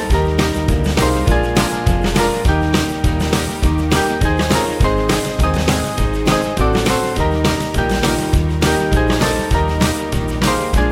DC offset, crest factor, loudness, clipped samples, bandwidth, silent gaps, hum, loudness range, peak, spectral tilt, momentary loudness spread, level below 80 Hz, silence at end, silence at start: under 0.1%; 14 dB; -16 LUFS; under 0.1%; 16.5 kHz; none; none; 0 LU; 0 dBFS; -5 dB/octave; 2 LU; -20 dBFS; 0 s; 0 s